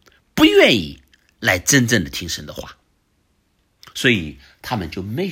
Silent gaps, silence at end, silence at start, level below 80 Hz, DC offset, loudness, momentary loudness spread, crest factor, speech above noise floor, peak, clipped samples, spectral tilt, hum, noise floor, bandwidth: none; 0 s; 0.35 s; -48 dBFS; under 0.1%; -17 LUFS; 21 LU; 20 dB; 44 dB; 0 dBFS; under 0.1%; -3.5 dB/octave; none; -64 dBFS; 16.5 kHz